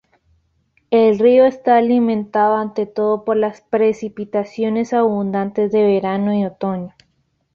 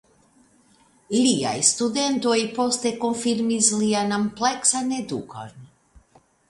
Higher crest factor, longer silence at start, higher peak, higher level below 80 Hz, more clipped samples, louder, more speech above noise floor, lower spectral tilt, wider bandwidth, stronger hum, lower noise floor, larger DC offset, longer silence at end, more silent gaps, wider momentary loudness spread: second, 14 dB vs 22 dB; second, 0.9 s vs 1.1 s; about the same, -2 dBFS vs -2 dBFS; about the same, -60 dBFS vs -62 dBFS; neither; first, -17 LUFS vs -22 LUFS; first, 49 dB vs 36 dB; first, -8 dB/octave vs -3 dB/octave; second, 7.2 kHz vs 11.5 kHz; neither; first, -65 dBFS vs -58 dBFS; neither; second, 0.65 s vs 0.85 s; neither; about the same, 10 LU vs 11 LU